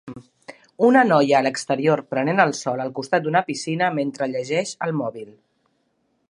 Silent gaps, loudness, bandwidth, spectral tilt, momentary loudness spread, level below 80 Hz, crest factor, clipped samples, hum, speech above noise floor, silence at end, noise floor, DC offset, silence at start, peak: none; -21 LUFS; 11 kHz; -5 dB/octave; 11 LU; -70 dBFS; 20 dB; under 0.1%; none; 48 dB; 1 s; -69 dBFS; under 0.1%; 0.05 s; -2 dBFS